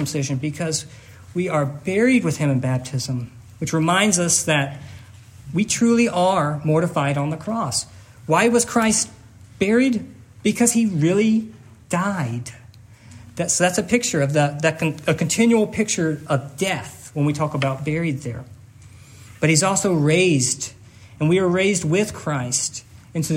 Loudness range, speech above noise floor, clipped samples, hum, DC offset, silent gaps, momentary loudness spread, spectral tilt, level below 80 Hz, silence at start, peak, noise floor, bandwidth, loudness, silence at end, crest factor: 3 LU; 25 dB; under 0.1%; none; under 0.1%; none; 12 LU; -4.5 dB/octave; -56 dBFS; 0 s; -2 dBFS; -45 dBFS; 16 kHz; -20 LUFS; 0 s; 18 dB